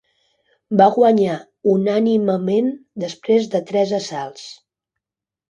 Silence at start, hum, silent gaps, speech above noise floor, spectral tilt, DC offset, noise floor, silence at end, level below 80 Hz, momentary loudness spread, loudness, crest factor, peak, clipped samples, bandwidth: 0.7 s; none; none; 71 dB; -6.5 dB/octave; under 0.1%; -89 dBFS; 0.95 s; -66 dBFS; 14 LU; -18 LUFS; 18 dB; 0 dBFS; under 0.1%; 9.2 kHz